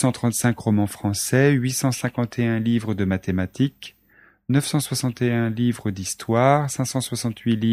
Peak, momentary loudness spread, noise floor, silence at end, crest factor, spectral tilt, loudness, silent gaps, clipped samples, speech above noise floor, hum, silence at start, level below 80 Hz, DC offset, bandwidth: -2 dBFS; 8 LU; -56 dBFS; 0 s; 20 dB; -5.5 dB/octave; -22 LUFS; none; under 0.1%; 35 dB; none; 0 s; -56 dBFS; under 0.1%; 15 kHz